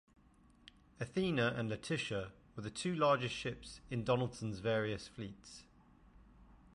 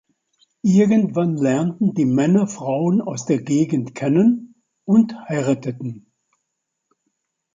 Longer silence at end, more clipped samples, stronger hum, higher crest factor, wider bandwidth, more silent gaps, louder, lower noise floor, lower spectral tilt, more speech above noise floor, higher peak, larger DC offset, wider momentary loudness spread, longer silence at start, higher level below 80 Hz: second, 0.2 s vs 1.6 s; neither; neither; about the same, 20 dB vs 16 dB; first, 11.5 kHz vs 7.6 kHz; neither; second, -38 LUFS vs -19 LUFS; second, -66 dBFS vs -77 dBFS; second, -5.5 dB/octave vs -7.5 dB/octave; second, 28 dB vs 60 dB; second, -20 dBFS vs -4 dBFS; neither; first, 16 LU vs 8 LU; first, 1 s vs 0.65 s; about the same, -64 dBFS vs -64 dBFS